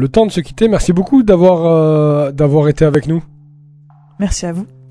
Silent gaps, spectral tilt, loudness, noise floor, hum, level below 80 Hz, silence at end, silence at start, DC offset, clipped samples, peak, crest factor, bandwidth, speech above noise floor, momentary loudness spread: none; -7 dB/octave; -12 LUFS; -43 dBFS; none; -30 dBFS; 0.25 s; 0 s; under 0.1%; 0.3%; 0 dBFS; 12 dB; 11 kHz; 32 dB; 11 LU